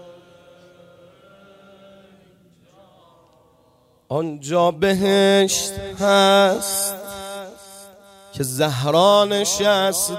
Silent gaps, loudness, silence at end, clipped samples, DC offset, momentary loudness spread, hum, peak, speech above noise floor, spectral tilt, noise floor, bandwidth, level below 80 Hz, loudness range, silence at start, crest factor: none; -18 LUFS; 0 s; under 0.1%; under 0.1%; 18 LU; none; -2 dBFS; 40 dB; -3.5 dB/octave; -57 dBFS; 16 kHz; -54 dBFS; 9 LU; 0.05 s; 18 dB